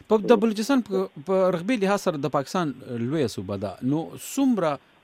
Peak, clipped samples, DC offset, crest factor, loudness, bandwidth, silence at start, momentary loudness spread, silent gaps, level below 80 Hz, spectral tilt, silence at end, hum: -4 dBFS; under 0.1%; under 0.1%; 20 dB; -25 LUFS; 16 kHz; 0.1 s; 9 LU; none; -66 dBFS; -6 dB/octave; 0.25 s; none